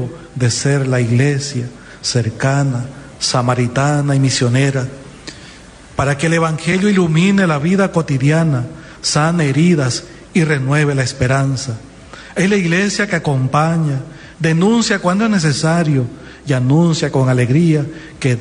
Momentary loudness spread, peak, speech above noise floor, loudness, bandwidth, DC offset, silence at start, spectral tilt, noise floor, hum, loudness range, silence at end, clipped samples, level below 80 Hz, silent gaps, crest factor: 13 LU; -2 dBFS; 24 dB; -15 LUFS; 10.5 kHz; under 0.1%; 0 s; -5.5 dB/octave; -38 dBFS; none; 2 LU; 0 s; under 0.1%; -44 dBFS; none; 12 dB